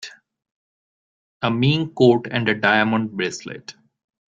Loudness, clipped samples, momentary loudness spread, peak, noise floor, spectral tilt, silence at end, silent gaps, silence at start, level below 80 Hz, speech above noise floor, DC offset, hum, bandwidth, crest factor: -19 LUFS; under 0.1%; 19 LU; -2 dBFS; under -90 dBFS; -6 dB/octave; 0.55 s; 0.51-1.40 s; 0 s; -58 dBFS; over 71 dB; under 0.1%; none; 7.8 kHz; 20 dB